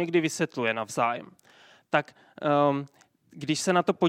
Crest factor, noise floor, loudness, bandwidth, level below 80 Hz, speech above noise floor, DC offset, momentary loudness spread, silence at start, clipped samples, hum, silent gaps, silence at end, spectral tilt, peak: 22 dB; -57 dBFS; -27 LUFS; 16 kHz; -76 dBFS; 30 dB; under 0.1%; 13 LU; 0 s; under 0.1%; none; none; 0 s; -5 dB/octave; -6 dBFS